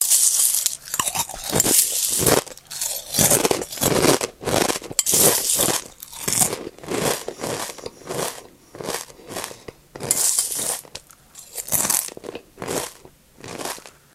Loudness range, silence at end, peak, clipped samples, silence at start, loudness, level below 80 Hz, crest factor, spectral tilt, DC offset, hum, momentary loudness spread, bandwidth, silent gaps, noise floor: 8 LU; 0.25 s; 0 dBFS; under 0.1%; 0 s; -19 LUFS; -50 dBFS; 22 dB; -2 dB/octave; under 0.1%; none; 19 LU; 16 kHz; none; -48 dBFS